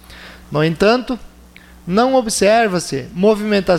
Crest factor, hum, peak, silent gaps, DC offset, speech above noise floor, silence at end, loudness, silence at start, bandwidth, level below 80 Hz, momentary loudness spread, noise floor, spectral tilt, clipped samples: 14 dB; none; -2 dBFS; none; under 0.1%; 27 dB; 0 s; -16 LUFS; 0.1 s; 16 kHz; -42 dBFS; 13 LU; -42 dBFS; -5 dB/octave; under 0.1%